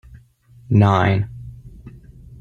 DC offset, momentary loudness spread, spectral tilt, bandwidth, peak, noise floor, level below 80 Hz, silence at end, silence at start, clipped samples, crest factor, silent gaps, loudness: under 0.1%; 24 LU; -8.5 dB/octave; 6.6 kHz; -2 dBFS; -49 dBFS; -44 dBFS; 0.05 s; 0.15 s; under 0.1%; 18 dB; none; -18 LUFS